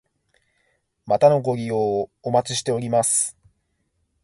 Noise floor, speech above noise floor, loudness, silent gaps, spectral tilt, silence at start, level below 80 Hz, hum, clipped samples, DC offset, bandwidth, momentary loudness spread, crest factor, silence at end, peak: -71 dBFS; 51 dB; -21 LUFS; none; -4 dB/octave; 1.05 s; -62 dBFS; none; under 0.1%; under 0.1%; 12 kHz; 8 LU; 20 dB; 0.9 s; -2 dBFS